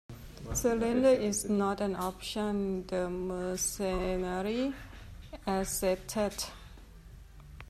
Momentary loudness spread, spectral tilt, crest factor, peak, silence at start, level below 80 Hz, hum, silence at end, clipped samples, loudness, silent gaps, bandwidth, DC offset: 16 LU; -4.5 dB/octave; 18 dB; -14 dBFS; 0.1 s; -48 dBFS; none; 0 s; under 0.1%; -32 LUFS; none; 14 kHz; under 0.1%